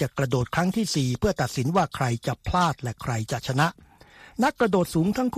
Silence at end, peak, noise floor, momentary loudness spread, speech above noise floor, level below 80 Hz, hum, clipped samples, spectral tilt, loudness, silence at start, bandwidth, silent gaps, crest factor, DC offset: 0 s; -6 dBFS; -51 dBFS; 6 LU; 26 dB; -44 dBFS; none; under 0.1%; -5.5 dB/octave; -25 LUFS; 0 s; 15 kHz; none; 18 dB; under 0.1%